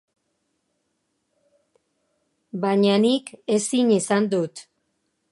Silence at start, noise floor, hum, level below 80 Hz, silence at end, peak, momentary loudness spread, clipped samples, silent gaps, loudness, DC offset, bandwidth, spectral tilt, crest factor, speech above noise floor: 2.55 s; -74 dBFS; none; -74 dBFS; 0.7 s; -6 dBFS; 12 LU; under 0.1%; none; -21 LUFS; under 0.1%; 11.5 kHz; -5 dB/octave; 18 dB; 53 dB